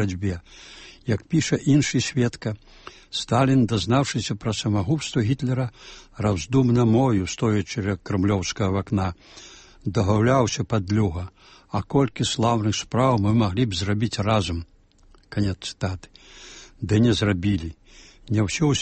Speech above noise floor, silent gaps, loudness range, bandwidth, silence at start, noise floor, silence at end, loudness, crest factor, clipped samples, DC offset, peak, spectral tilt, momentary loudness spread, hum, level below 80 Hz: 32 dB; none; 3 LU; 8.8 kHz; 0 s; -54 dBFS; 0 s; -23 LUFS; 16 dB; under 0.1%; under 0.1%; -6 dBFS; -6 dB/octave; 16 LU; none; -46 dBFS